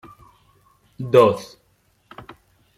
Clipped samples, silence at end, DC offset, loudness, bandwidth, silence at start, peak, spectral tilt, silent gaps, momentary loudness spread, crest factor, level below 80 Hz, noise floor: under 0.1%; 1.3 s; under 0.1%; -17 LUFS; 15.5 kHz; 1 s; -2 dBFS; -6.5 dB/octave; none; 27 LU; 22 dB; -60 dBFS; -63 dBFS